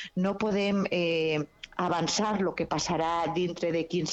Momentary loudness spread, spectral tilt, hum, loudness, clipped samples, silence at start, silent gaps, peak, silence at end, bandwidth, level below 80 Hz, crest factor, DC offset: 4 LU; -4.5 dB/octave; none; -29 LUFS; under 0.1%; 0 s; none; -14 dBFS; 0 s; 8.2 kHz; -58 dBFS; 14 dB; under 0.1%